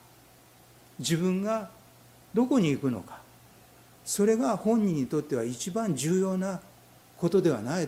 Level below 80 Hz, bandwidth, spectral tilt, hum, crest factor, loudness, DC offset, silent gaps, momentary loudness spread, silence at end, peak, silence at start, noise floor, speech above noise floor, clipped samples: -66 dBFS; 16.5 kHz; -5.5 dB/octave; none; 16 dB; -28 LUFS; under 0.1%; none; 11 LU; 0 s; -12 dBFS; 1 s; -56 dBFS; 29 dB; under 0.1%